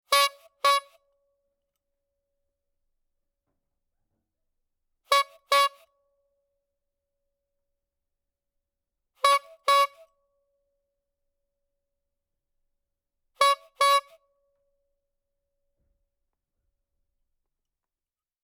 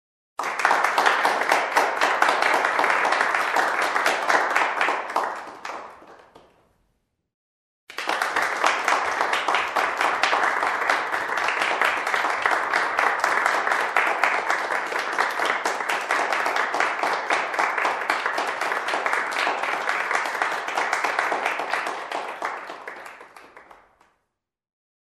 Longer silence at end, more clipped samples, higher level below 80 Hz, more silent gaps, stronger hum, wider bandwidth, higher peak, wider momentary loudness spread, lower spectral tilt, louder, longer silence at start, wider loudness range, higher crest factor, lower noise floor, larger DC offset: first, 4.45 s vs 1.45 s; neither; second, -78 dBFS vs -72 dBFS; second, none vs 7.34-7.87 s; neither; first, 18 kHz vs 13.5 kHz; second, -8 dBFS vs -2 dBFS; second, 4 LU vs 10 LU; second, 3 dB/octave vs -0.5 dB/octave; about the same, -24 LUFS vs -22 LUFS; second, 0.1 s vs 0.4 s; second, 4 LU vs 8 LU; about the same, 22 dB vs 22 dB; first, under -90 dBFS vs -79 dBFS; neither